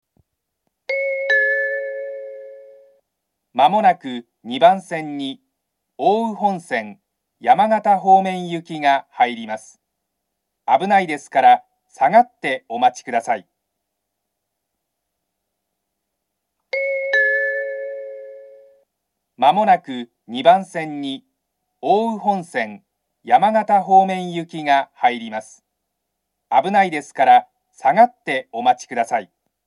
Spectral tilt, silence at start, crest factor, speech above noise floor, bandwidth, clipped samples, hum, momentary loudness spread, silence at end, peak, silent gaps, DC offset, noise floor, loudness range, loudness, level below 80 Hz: -5 dB/octave; 0.9 s; 20 dB; 60 dB; 11.5 kHz; under 0.1%; none; 16 LU; 0.45 s; 0 dBFS; none; under 0.1%; -78 dBFS; 5 LU; -18 LUFS; -82 dBFS